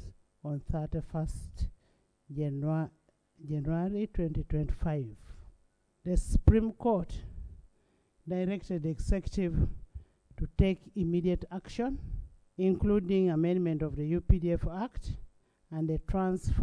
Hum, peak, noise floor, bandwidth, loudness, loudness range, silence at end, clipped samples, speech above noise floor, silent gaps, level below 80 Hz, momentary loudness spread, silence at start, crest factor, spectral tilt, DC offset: none; -8 dBFS; -71 dBFS; 11 kHz; -32 LUFS; 6 LU; 0 s; under 0.1%; 40 dB; none; -38 dBFS; 16 LU; 0 s; 24 dB; -8.5 dB/octave; under 0.1%